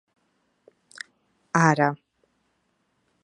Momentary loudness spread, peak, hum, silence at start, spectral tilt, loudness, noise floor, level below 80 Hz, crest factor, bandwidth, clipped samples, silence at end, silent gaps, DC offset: 22 LU; -2 dBFS; none; 1.55 s; -6 dB/octave; -22 LUFS; -72 dBFS; -74 dBFS; 26 dB; 11 kHz; under 0.1%; 1.3 s; none; under 0.1%